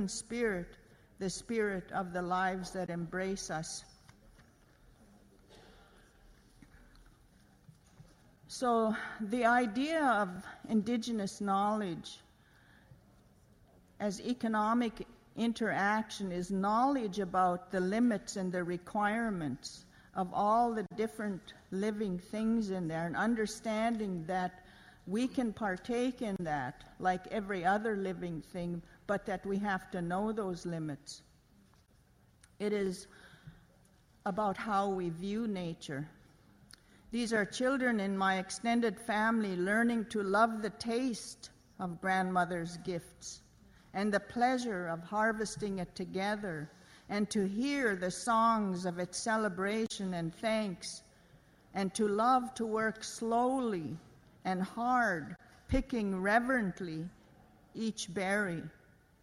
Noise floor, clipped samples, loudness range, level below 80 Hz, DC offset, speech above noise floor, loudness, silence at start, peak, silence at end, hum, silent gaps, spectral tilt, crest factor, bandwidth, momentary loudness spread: -66 dBFS; under 0.1%; 6 LU; -60 dBFS; under 0.1%; 32 dB; -34 LUFS; 0 s; -16 dBFS; 0.5 s; none; none; -5 dB/octave; 20 dB; 15 kHz; 13 LU